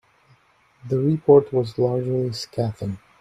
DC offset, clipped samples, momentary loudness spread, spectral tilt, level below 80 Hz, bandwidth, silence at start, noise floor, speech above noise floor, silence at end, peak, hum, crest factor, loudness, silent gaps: under 0.1%; under 0.1%; 11 LU; -8 dB/octave; -58 dBFS; 11 kHz; 0.85 s; -59 dBFS; 38 dB; 0.25 s; -2 dBFS; none; 20 dB; -21 LUFS; none